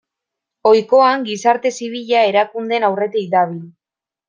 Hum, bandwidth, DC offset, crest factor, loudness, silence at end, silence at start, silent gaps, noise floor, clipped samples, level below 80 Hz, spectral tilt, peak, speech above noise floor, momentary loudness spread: none; 9.6 kHz; under 0.1%; 14 dB; -16 LUFS; 0.6 s; 0.65 s; none; -89 dBFS; under 0.1%; -66 dBFS; -4.5 dB/octave; -2 dBFS; 73 dB; 9 LU